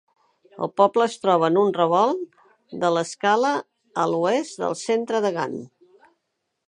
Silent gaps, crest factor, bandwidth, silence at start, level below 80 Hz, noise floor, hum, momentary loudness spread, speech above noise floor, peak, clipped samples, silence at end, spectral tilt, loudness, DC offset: none; 20 dB; 11 kHz; 0.55 s; -76 dBFS; -77 dBFS; none; 12 LU; 56 dB; -4 dBFS; under 0.1%; 1 s; -5 dB/octave; -22 LUFS; under 0.1%